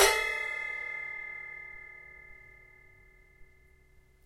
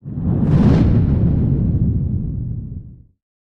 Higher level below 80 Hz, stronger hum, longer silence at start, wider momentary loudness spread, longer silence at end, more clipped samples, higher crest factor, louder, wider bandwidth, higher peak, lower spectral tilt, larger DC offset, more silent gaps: second, -58 dBFS vs -26 dBFS; neither; about the same, 0 s vs 0.05 s; first, 23 LU vs 14 LU; second, 0.25 s vs 0.65 s; neither; first, 30 dB vs 14 dB; second, -33 LUFS vs -17 LUFS; first, 16 kHz vs 6.2 kHz; second, -6 dBFS vs -2 dBFS; second, 0 dB/octave vs -10.5 dB/octave; neither; neither